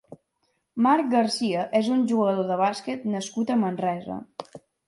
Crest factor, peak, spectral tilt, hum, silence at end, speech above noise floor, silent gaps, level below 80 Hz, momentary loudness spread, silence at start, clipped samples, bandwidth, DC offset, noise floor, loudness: 16 dB; -8 dBFS; -5.5 dB/octave; none; 0.3 s; 50 dB; none; -72 dBFS; 14 LU; 0.1 s; under 0.1%; 11.5 kHz; under 0.1%; -73 dBFS; -24 LUFS